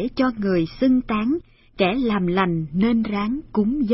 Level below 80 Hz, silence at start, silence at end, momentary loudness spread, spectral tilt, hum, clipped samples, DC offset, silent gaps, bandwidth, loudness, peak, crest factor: -44 dBFS; 0 s; 0 s; 4 LU; -11 dB/octave; none; under 0.1%; under 0.1%; none; 5.8 kHz; -22 LUFS; -4 dBFS; 16 dB